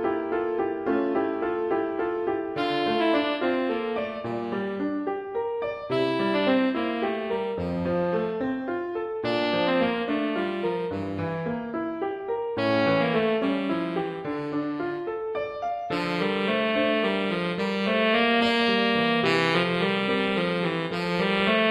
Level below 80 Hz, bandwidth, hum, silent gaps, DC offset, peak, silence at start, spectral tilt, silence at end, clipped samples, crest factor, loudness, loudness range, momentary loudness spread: -58 dBFS; 12 kHz; none; none; under 0.1%; -8 dBFS; 0 s; -6.5 dB/octave; 0 s; under 0.1%; 18 dB; -26 LUFS; 5 LU; 8 LU